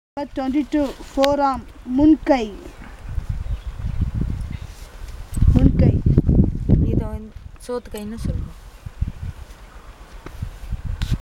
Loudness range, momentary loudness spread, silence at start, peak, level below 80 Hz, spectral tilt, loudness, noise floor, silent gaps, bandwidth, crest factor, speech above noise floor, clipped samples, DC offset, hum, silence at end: 12 LU; 23 LU; 0.15 s; 0 dBFS; -26 dBFS; -8 dB/octave; -21 LUFS; -40 dBFS; none; 15 kHz; 20 dB; 20 dB; under 0.1%; under 0.1%; none; 0.15 s